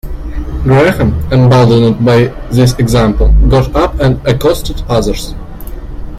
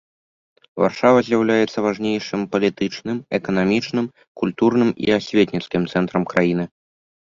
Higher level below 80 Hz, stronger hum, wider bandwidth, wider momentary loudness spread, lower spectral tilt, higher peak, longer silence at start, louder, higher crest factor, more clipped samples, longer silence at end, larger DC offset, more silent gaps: first, -16 dBFS vs -56 dBFS; neither; first, 15 kHz vs 7.6 kHz; first, 16 LU vs 9 LU; about the same, -7 dB/octave vs -6.5 dB/octave; about the same, 0 dBFS vs -2 dBFS; second, 0.05 s vs 0.75 s; first, -10 LUFS vs -20 LUFS; second, 10 dB vs 18 dB; neither; second, 0 s vs 0.55 s; neither; second, none vs 4.27-4.35 s